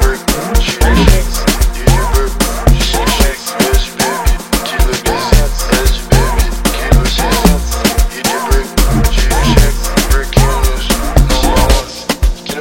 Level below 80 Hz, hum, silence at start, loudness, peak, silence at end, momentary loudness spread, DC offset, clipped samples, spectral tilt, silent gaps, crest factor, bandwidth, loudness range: -12 dBFS; none; 0 s; -13 LUFS; 0 dBFS; 0 s; 4 LU; under 0.1%; 0.5%; -4 dB/octave; none; 10 dB; 17 kHz; 1 LU